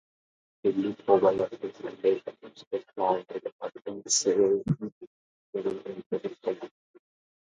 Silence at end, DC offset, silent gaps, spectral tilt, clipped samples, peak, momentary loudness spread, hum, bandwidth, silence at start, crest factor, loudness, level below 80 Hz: 0.8 s; under 0.1%; 2.67-2.71 s, 3.52-3.59 s, 4.92-5.01 s, 5.07-5.53 s, 6.06-6.10 s; -4.5 dB/octave; under 0.1%; -8 dBFS; 16 LU; none; 9.6 kHz; 0.65 s; 22 dB; -29 LUFS; -68 dBFS